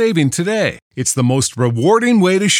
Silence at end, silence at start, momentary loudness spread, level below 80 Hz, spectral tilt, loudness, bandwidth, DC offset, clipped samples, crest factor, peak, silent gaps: 0 s; 0 s; 6 LU; -54 dBFS; -4.5 dB/octave; -15 LUFS; 17.5 kHz; under 0.1%; under 0.1%; 14 dB; -2 dBFS; 0.82-0.91 s